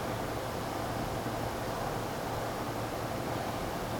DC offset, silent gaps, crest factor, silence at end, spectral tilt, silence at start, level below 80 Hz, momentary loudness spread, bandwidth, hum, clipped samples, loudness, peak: under 0.1%; none; 14 dB; 0 s; -5 dB/octave; 0 s; -50 dBFS; 1 LU; over 20 kHz; none; under 0.1%; -35 LUFS; -20 dBFS